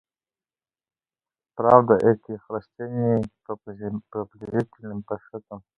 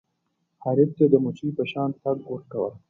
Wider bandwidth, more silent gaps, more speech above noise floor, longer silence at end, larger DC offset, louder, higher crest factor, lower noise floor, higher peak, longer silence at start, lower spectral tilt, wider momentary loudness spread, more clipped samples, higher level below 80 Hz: first, 5.8 kHz vs 3.9 kHz; neither; first, over 66 dB vs 51 dB; about the same, 0.2 s vs 0.1 s; neither; about the same, -24 LUFS vs -24 LUFS; about the same, 24 dB vs 20 dB; first, under -90 dBFS vs -75 dBFS; first, 0 dBFS vs -4 dBFS; first, 1.55 s vs 0.6 s; about the same, -10 dB/octave vs -9.5 dB/octave; first, 19 LU vs 11 LU; neither; first, -60 dBFS vs -68 dBFS